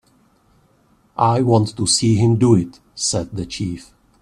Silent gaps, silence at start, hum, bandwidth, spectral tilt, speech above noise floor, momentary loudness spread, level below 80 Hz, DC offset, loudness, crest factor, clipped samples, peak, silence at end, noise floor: none; 1.2 s; none; 11 kHz; -5.5 dB/octave; 41 dB; 13 LU; -48 dBFS; under 0.1%; -18 LUFS; 18 dB; under 0.1%; -2 dBFS; 0.4 s; -57 dBFS